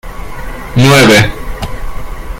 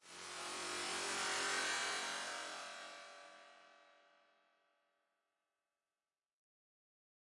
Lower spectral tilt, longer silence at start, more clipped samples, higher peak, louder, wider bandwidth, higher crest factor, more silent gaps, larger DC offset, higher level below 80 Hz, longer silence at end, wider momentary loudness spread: first, -5 dB/octave vs 0.5 dB/octave; about the same, 0.05 s vs 0.05 s; first, 0.6% vs under 0.1%; first, 0 dBFS vs -28 dBFS; first, -7 LUFS vs -41 LUFS; first, 17 kHz vs 11.5 kHz; second, 10 dB vs 20 dB; neither; neither; first, -22 dBFS vs under -90 dBFS; second, 0 s vs 3.25 s; about the same, 22 LU vs 20 LU